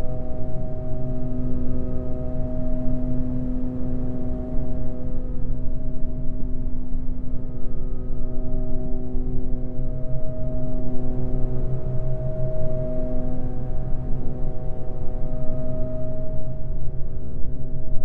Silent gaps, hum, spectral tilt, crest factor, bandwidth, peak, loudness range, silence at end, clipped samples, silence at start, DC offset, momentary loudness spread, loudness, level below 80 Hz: none; none; -12 dB/octave; 12 dB; 1.4 kHz; -4 dBFS; 3 LU; 0 s; under 0.1%; 0 s; under 0.1%; 5 LU; -31 LUFS; -24 dBFS